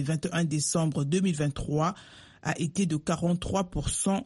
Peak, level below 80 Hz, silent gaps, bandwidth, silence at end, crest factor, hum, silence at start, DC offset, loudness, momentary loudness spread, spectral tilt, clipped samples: -14 dBFS; -46 dBFS; none; 11.5 kHz; 0 s; 14 dB; none; 0 s; under 0.1%; -29 LUFS; 5 LU; -5 dB/octave; under 0.1%